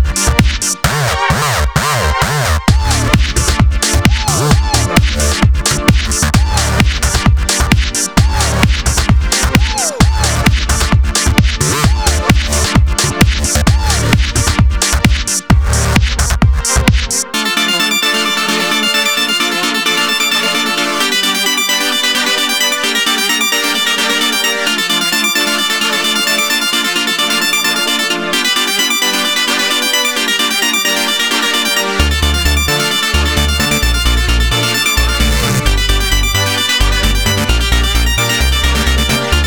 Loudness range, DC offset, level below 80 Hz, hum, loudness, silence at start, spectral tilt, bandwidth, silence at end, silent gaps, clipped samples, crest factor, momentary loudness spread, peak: 1 LU; 0.6%; -18 dBFS; none; -12 LUFS; 0 s; -3 dB/octave; over 20 kHz; 0 s; none; under 0.1%; 12 dB; 2 LU; 0 dBFS